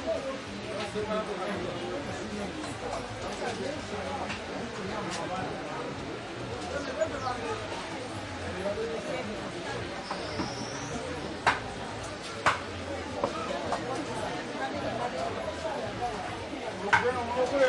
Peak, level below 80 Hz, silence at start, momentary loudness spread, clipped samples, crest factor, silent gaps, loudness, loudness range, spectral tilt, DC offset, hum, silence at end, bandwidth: -10 dBFS; -54 dBFS; 0 s; 8 LU; under 0.1%; 24 dB; none; -33 LUFS; 3 LU; -4.5 dB/octave; under 0.1%; none; 0 s; 11.5 kHz